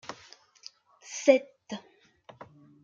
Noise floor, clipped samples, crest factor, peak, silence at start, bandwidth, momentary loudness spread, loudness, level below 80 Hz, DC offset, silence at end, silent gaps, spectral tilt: -61 dBFS; under 0.1%; 26 dB; -6 dBFS; 0.1 s; 7.6 kHz; 27 LU; -26 LUFS; -82 dBFS; under 0.1%; 1.05 s; none; -3 dB/octave